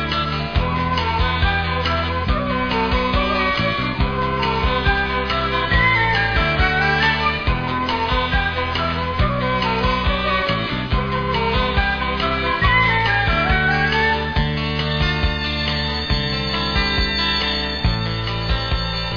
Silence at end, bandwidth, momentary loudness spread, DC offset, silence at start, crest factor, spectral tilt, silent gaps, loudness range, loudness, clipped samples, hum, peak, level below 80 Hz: 0 s; 5.4 kHz; 5 LU; 0.5%; 0 s; 16 dB; -6 dB/octave; none; 2 LU; -19 LUFS; under 0.1%; none; -4 dBFS; -26 dBFS